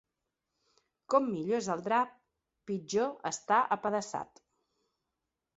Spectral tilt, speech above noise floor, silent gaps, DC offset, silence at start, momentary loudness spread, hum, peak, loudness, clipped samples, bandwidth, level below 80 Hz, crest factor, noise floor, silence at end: -4 dB/octave; 56 dB; none; under 0.1%; 1.1 s; 11 LU; none; -12 dBFS; -32 LUFS; under 0.1%; 8 kHz; -76 dBFS; 22 dB; -87 dBFS; 1.35 s